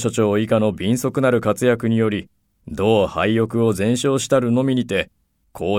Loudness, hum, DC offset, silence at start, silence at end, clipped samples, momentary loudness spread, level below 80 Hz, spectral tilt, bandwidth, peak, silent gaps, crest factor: -19 LUFS; none; under 0.1%; 0 s; 0 s; under 0.1%; 6 LU; -50 dBFS; -6 dB/octave; 16.5 kHz; -4 dBFS; none; 16 dB